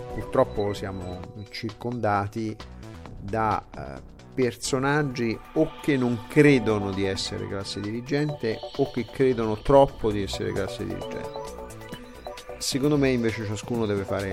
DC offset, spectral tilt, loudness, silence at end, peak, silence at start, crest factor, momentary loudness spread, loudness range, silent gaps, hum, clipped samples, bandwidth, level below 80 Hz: under 0.1%; -5.5 dB/octave; -26 LUFS; 0 s; -4 dBFS; 0 s; 22 dB; 19 LU; 6 LU; none; none; under 0.1%; 16 kHz; -46 dBFS